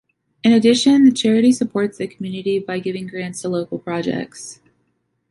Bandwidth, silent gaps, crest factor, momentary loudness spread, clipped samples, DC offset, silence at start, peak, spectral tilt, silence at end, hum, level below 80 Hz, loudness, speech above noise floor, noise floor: 11.5 kHz; none; 14 dB; 14 LU; under 0.1%; under 0.1%; 0.45 s; -4 dBFS; -5 dB/octave; 0.75 s; none; -60 dBFS; -18 LUFS; 51 dB; -68 dBFS